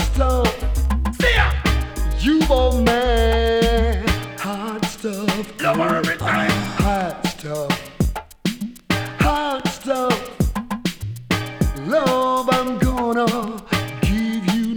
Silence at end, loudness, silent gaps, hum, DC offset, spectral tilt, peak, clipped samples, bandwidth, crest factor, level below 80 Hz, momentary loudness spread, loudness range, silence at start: 0 s; -20 LUFS; none; none; under 0.1%; -5.5 dB/octave; -2 dBFS; under 0.1%; over 20 kHz; 16 dB; -26 dBFS; 8 LU; 4 LU; 0 s